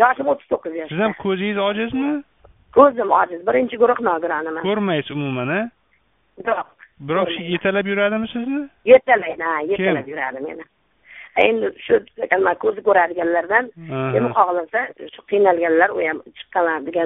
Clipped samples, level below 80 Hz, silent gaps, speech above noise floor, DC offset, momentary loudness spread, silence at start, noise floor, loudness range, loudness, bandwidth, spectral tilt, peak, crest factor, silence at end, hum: under 0.1%; -58 dBFS; none; 44 dB; under 0.1%; 11 LU; 0 s; -63 dBFS; 5 LU; -19 LUFS; 3.9 kHz; -3.5 dB/octave; 0 dBFS; 20 dB; 0 s; none